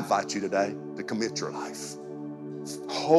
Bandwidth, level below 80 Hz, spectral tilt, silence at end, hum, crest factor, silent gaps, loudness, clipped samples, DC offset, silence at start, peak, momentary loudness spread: 14.5 kHz; -78 dBFS; -4 dB/octave; 0 s; none; 22 dB; none; -32 LUFS; under 0.1%; under 0.1%; 0 s; -8 dBFS; 11 LU